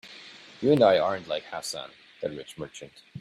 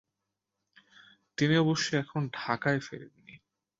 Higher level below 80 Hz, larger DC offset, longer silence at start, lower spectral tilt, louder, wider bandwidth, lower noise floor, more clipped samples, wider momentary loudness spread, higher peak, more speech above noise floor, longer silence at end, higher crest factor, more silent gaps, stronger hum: about the same, -66 dBFS vs -70 dBFS; neither; second, 0.05 s vs 1.4 s; about the same, -5 dB/octave vs -5.5 dB/octave; first, -26 LUFS vs -29 LUFS; first, 15 kHz vs 7.8 kHz; second, -48 dBFS vs -86 dBFS; neither; first, 24 LU vs 19 LU; first, -8 dBFS vs -12 dBFS; second, 21 dB vs 57 dB; second, 0 s vs 0.45 s; about the same, 20 dB vs 20 dB; neither; neither